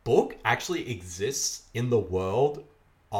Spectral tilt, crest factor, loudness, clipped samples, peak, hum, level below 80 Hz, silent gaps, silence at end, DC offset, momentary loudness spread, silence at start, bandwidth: -4 dB/octave; 20 dB; -28 LUFS; under 0.1%; -8 dBFS; none; -56 dBFS; none; 0 s; under 0.1%; 7 LU; 0.05 s; 17.5 kHz